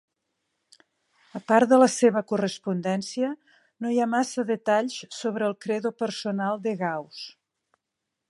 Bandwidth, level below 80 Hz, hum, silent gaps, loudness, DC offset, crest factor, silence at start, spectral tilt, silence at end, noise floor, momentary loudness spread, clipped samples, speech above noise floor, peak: 11.5 kHz; -78 dBFS; none; none; -25 LUFS; under 0.1%; 22 dB; 1.35 s; -5 dB/octave; 1 s; -83 dBFS; 15 LU; under 0.1%; 59 dB; -4 dBFS